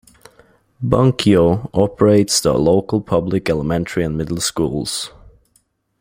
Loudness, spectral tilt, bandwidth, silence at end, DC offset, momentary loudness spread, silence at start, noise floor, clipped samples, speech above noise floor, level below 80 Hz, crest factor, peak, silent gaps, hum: -17 LUFS; -5.5 dB/octave; 16.5 kHz; 0.95 s; under 0.1%; 8 LU; 0.8 s; -61 dBFS; under 0.1%; 46 dB; -42 dBFS; 18 dB; 0 dBFS; none; none